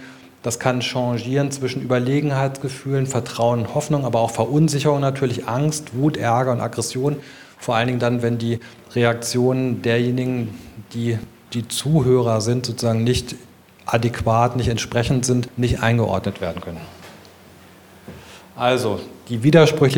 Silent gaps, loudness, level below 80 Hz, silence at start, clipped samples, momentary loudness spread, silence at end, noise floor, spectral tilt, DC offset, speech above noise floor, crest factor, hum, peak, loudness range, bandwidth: none; -20 LUFS; -46 dBFS; 0 s; under 0.1%; 12 LU; 0 s; -46 dBFS; -5.5 dB/octave; under 0.1%; 26 dB; 20 dB; none; 0 dBFS; 3 LU; 18.5 kHz